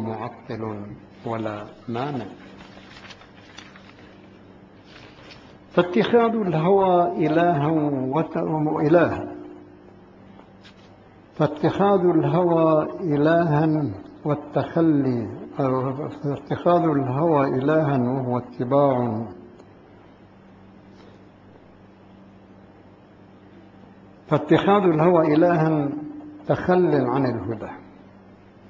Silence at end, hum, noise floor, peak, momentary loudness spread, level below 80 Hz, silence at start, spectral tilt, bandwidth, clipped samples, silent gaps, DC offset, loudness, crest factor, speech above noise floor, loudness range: 0.8 s; none; -49 dBFS; -4 dBFS; 18 LU; -56 dBFS; 0 s; -9 dB/octave; 7.2 kHz; under 0.1%; none; under 0.1%; -21 LUFS; 20 dB; 28 dB; 12 LU